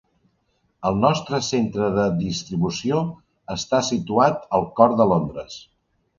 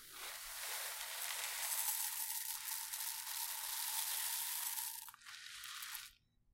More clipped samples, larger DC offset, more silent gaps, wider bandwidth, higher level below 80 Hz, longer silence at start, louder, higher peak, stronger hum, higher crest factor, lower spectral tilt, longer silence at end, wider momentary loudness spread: neither; neither; neither; second, 7.6 kHz vs 17 kHz; first, -50 dBFS vs -78 dBFS; first, 0.8 s vs 0 s; first, -21 LUFS vs -41 LUFS; first, -2 dBFS vs -18 dBFS; neither; second, 20 dB vs 26 dB; first, -5.5 dB/octave vs 4 dB/octave; first, 0.6 s vs 0.4 s; about the same, 13 LU vs 12 LU